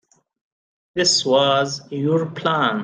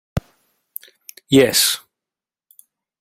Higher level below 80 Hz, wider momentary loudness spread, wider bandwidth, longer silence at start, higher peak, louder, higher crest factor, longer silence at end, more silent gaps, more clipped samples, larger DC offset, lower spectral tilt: second, -64 dBFS vs -44 dBFS; second, 9 LU vs 23 LU; second, 10 kHz vs 16.5 kHz; first, 0.95 s vs 0.15 s; about the same, -4 dBFS vs -2 dBFS; second, -19 LUFS vs -16 LUFS; about the same, 16 dB vs 20 dB; second, 0 s vs 1.25 s; neither; neither; neither; about the same, -3.5 dB/octave vs -3 dB/octave